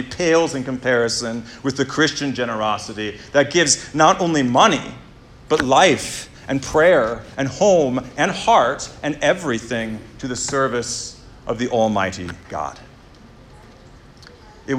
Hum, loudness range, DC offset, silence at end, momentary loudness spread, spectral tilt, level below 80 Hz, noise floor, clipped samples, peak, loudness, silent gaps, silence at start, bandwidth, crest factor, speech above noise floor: none; 7 LU; under 0.1%; 0 s; 14 LU; -3.5 dB/octave; -48 dBFS; -44 dBFS; under 0.1%; 0 dBFS; -19 LUFS; none; 0 s; 14.5 kHz; 18 dB; 26 dB